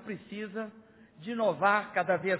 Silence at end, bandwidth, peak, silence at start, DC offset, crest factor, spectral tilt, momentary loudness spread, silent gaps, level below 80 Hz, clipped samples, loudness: 0 s; 4 kHz; -12 dBFS; 0 s; under 0.1%; 20 dB; -3.5 dB/octave; 15 LU; none; -76 dBFS; under 0.1%; -31 LUFS